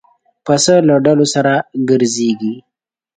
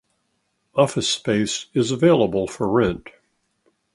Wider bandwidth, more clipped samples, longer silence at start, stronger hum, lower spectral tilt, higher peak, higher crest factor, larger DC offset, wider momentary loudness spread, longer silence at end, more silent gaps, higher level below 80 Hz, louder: second, 9.4 kHz vs 11.5 kHz; neither; second, 0.45 s vs 0.75 s; neither; about the same, -4.5 dB/octave vs -5 dB/octave; about the same, 0 dBFS vs -2 dBFS; second, 14 dB vs 20 dB; neither; first, 12 LU vs 7 LU; second, 0.55 s vs 0.95 s; neither; second, -56 dBFS vs -50 dBFS; first, -13 LUFS vs -20 LUFS